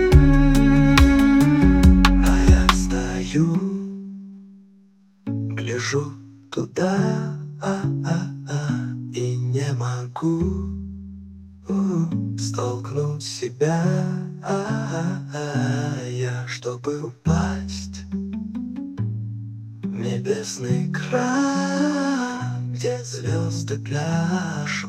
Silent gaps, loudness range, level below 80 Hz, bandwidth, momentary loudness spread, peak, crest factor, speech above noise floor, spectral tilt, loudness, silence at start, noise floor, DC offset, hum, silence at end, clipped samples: none; 10 LU; -28 dBFS; 16 kHz; 15 LU; 0 dBFS; 20 dB; 31 dB; -6 dB/octave; -22 LUFS; 0 s; -54 dBFS; under 0.1%; none; 0 s; under 0.1%